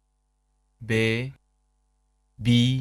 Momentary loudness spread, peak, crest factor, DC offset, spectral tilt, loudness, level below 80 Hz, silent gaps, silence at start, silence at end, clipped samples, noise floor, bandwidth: 16 LU; -8 dBFS; 20 dB; under 0.1%; -6 dB/octave; -24 LUFS; -54 dBFS; none; 0.8 s; 0 s; under 0.1%; -71 dBFS; 11.5 kHz